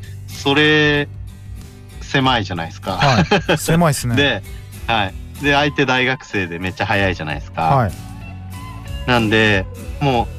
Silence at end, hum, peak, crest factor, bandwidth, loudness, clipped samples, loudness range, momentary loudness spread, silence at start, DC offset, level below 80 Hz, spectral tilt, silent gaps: 0 s; none; -4 dBFS; 14 dB; 15.5 kHz; -17 LUFS; under 0.1%; 2 LU; 19 LU; 0 s; under 0.1%; -34 dBFS; -5 dB/octave; none